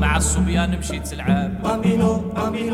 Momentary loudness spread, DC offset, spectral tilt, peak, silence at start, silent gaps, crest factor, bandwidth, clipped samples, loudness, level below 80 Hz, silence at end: 7 LU; under 0.1%; -5.5 dB/octave; -6 dBFS; 0 s; none; 14 dB; 14.5 kHz; under 0.1%; -21 LUFS; -28 dBFS; 0 s